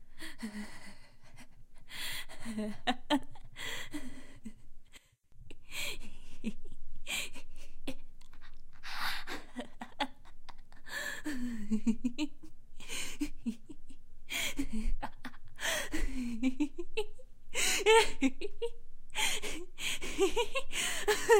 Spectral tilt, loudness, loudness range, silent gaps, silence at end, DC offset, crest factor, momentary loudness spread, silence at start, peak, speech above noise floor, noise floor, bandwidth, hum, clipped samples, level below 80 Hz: -2.5 dB/octave; -36 LUFS; 11 LU; none; 0 s; under 0.1%; 20 dB; 20 LU; 0 s; -12 dBFS; 27 dB; -57 dBFS; 16 kHz; none; under 0.1%; -42 dBFS